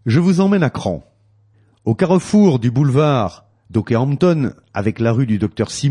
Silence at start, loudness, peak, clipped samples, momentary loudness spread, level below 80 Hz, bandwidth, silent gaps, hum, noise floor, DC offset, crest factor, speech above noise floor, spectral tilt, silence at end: 0.05 s; -17 LUFS; -4 dBFS; under 0.1%; 10 LU; -50 dBFS; 11 kHz; none; none; -54 dBFS; under 0.1%; 12 dB; 39 dB; -7.5 dB/octave; 0 s